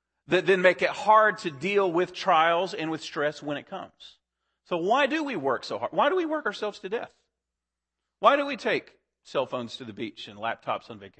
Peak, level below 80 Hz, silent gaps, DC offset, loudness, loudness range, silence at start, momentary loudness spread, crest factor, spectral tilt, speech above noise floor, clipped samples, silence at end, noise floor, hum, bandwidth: -6 dBFS; -74 dBFS; none; under 0.1%; -26 LUFS; 6 LU; 0.3 s; 14 LU; 22 dB; -5 dB/octave; 61 dB; under 0.1%; 0.1 s; -87 dBFS; none; 8.8 kHz